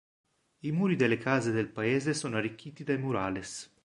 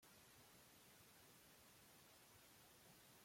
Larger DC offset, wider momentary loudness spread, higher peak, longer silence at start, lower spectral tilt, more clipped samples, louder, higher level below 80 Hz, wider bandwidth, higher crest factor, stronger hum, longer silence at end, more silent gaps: neither; first, 11 LU vs 0 LU; first, -10 dBFS vs -56 dBFS; first, 0.65 s vs 0 s; first, -5.5 dB/octave vs -2.5 dB/octave; neither; first, -31 LUFS vs -67 LUFS; first, -64 dBFS vs -88 dBFS; second, 11.5 kHz vs 16.5 kHz; first, 20 dB vs 14 dB; neither; first, 0.2 s vs 0 s; neither